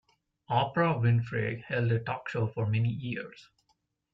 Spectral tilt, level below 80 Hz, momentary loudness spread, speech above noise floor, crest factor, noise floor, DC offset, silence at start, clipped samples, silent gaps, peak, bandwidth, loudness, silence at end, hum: -8.5 dB/octave; -64 dBFS; 9 LU; 46 dB; 16 dB; -75 dBFS; under 0.1%; 0.5 s; under 0.1%; none; -14 dBFS; 5.8 kHz; -30 LUFS; 0.7 s; none